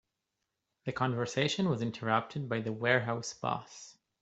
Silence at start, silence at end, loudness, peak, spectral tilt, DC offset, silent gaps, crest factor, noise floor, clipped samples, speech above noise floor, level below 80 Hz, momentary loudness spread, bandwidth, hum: 0.85 s; 0.3 s; -33 LUFS; -10 dBFS; -5 dB/octave; under 0.1%; none; 24 dB; -85 dBFS; under 0.1%; 53 dB; -70 dBFS; 13 LU; 8.2 kHz; none